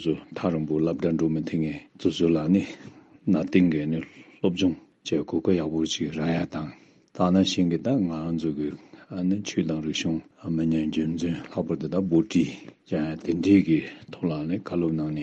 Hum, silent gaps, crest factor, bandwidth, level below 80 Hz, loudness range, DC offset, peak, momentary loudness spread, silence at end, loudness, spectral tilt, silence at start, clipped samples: none; none; 18 dB; 8.2 kHz; -58 dBFS; 3 LU; under 0.1%; -8 dBFS; 11 LU; 0 s; -26 LUFS; -6.5 dB/octave; 0 s; under 0.1%